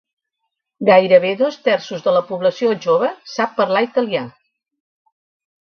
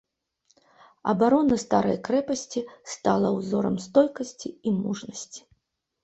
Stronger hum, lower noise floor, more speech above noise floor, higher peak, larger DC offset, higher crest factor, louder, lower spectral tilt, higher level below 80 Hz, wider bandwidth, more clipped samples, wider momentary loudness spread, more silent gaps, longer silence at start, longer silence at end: neither; about the same, -77 dBFS vs -74 dBFS; first, 61 dB vs 50 dB; first, 0 dBFS vs -6 dBFS; neither; about the same, 18 dB vs 20 dB; first, -17 LUFS vs -25 LUFS; about the same, -5.5 dB/octave vs -6 dB/octave; second, -66 dBFS vs -60 dBFS; second, 6.8 kHz vs 8.2 kHz; neither; second, 9 LU vs 14 LU; neither; second, 0.8 s vs 1.05 s; first, 1.4 s vs 0.65 s